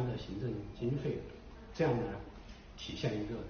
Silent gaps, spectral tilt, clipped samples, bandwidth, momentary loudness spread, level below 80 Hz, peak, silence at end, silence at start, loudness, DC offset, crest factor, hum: none; -6 dB/octave; under 0.1%; 6.6 kHz; 18 LU; -52 dBFS; -20 dBFS; 0 s; 0 s; -38 LUFS; under 0.1%; 18 dB; none